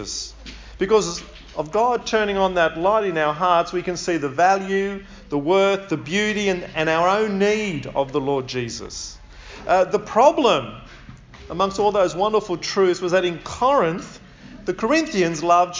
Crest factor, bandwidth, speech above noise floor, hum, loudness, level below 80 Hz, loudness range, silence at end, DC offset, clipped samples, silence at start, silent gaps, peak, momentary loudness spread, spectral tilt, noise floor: 18 dB; 7.6 kHz; 22 dB; none; -20 LUFS; -46 dBFS; 2 LU; 0 s; under 0.1%; under 0.1%; 0 s; none; -2 dBFS; 14 LU; -4.5 dB/octave; -42 dBFS